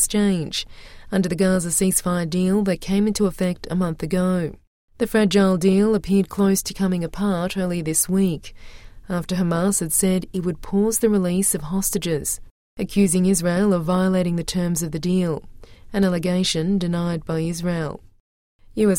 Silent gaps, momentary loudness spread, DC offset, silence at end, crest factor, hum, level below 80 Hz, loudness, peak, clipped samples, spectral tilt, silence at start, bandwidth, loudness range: 4.67-4.88 s, 12.51-12.77 s, 18.20-18.59 s; 8 LU; under 0.1%; 0 s; 16 dB; none; -42 dBFS; -21 LUFS; -4 dBFS; under 0.1%; -5 dB/octave; 0 s; 16.5 kHz; 3 LU